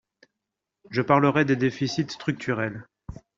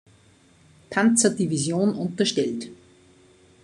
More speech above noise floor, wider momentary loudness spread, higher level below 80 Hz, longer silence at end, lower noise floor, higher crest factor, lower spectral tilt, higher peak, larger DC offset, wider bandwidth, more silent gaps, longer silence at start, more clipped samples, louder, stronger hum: first, 61 dB vs 34 dB; first, 18 LU vs 10 LU; first, -56 dBFS vs -66 dBFS; second, 0.25 s vs 0.9 s; first, -85 dBFS vs -56 dBFS; about the same, 22 dB vs 20 dB; first, -5.5 dB/octave vs -4 dB/octave; about the same, -4 dBFS vs -6 dBFS; neither; second, 7.6 kHz vs 12 kHz; neither; about the same, 0.9 s vs 0.9 s; neither; about the same, -24 LUFS vs -23 LUFS; neither